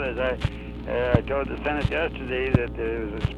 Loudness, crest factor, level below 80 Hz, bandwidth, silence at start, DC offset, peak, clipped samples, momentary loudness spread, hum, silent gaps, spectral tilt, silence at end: -26 LUFS; 24 dB; -34 dBFS; 10 kHz; 0 s; under 0.1%; -2 dBFS; under 0.1%; 7 LU; 60 Hz at -35 dBFS; none; -8 dB/octave; 0 s